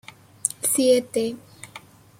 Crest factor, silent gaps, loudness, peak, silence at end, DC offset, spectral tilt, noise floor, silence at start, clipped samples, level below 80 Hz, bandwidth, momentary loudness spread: 24 dB; none; -22 LUFS; 0 dBFS; 0.4 s; under 0.1%; -2.5 dB/octave; -46 dBFS; 0.45 s; under 0.1%; -68 dBFS; 16.5 kHz; 23 LU